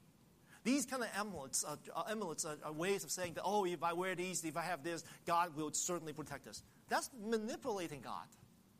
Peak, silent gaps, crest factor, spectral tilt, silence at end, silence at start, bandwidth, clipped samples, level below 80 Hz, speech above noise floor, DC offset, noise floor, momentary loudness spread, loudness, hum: -24 dBFS; none; 18 dB; -3 dB/octave; 0.35 s; 0.5 s; 15.5 kHz; under 0.1%; -76 dBFS; 26 dB; under 0.1%; -67 dBFS; 11 LU; -41 LUFS; none